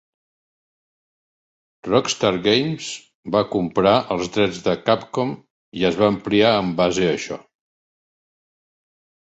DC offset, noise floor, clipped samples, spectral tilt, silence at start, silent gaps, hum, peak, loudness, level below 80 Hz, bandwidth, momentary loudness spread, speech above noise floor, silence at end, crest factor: under 0.1%; under -90 dBFS; under 0.1%; -5 dB/octave; 1.85 s; 3.15-3.23 s, 5.50-5.72 s; none; -2 dBFS; -20 LUFS; -54 dBFS; 8.2 kHz; 14 LU; over 71 dB; 1.9 s; 20 dB